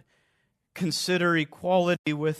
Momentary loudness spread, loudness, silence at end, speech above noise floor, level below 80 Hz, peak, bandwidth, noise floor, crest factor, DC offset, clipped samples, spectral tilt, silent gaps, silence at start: 7 LU; -25 LUFS; 0 s; 48 dB; -70 dBFS; -10 dBFS; 13.5 kHz; -73 dBFS; 16 dB; under 0.1%; under 0.1%; -5 dB/octave; 1.99-2.04 s; 0.75 s